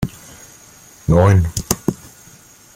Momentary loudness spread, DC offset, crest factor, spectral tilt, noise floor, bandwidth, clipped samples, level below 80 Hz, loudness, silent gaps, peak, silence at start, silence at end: 26 LU; under 0.1%; 18 dB; -6 dB/octave; -45 dBFS; 16.5 kHz; under 0.1%; -36 dBFS; -17 LUFS; none; 0 dBFS; 0 s; 0.8 s